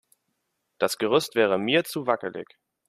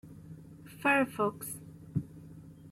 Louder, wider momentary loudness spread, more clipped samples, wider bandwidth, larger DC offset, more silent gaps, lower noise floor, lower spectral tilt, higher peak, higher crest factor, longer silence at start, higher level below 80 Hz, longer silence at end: first, -24 LUFS vs -32 LUFS; second, 8 LU vs 23 LU; neither; about the same, 15 kHz vs 16.5 kHz; neither; neither; first, -77 dBFS vs -51 dBFS; second, -4 dB/octave vs -5.5 dB/octave; first, -6 dBFS vs -16 dBFS; about the same, 20 dB vs 20 dB; first, 0.8 s vs 0.05 s; second, -72 dBFS vs -66 dBFS; first, 0.45 s vs 0 s